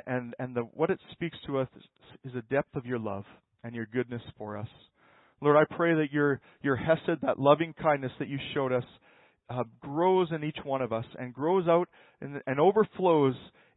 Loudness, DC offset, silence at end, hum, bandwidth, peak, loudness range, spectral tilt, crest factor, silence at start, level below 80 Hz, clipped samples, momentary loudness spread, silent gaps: -29 LUFS; under 0.1%; 0.3 s; none; 4.1 kHz; -6 dBFS; 8 LU; -10.5 dB/octave; 22 dB; 0.05 s; -66 dBFS; under 0.1%; 16 LU; none